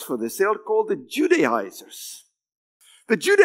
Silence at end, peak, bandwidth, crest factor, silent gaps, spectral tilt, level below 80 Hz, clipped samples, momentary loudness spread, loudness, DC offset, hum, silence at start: 0 s; -2 dBFS; 16 kHz; 20 dB; 2.55-2.80 s; -3.5 dB/octave; -86 dBFS; under 0.1%; 17 LU; -22 LUFS; under 0.1%; none; 0 s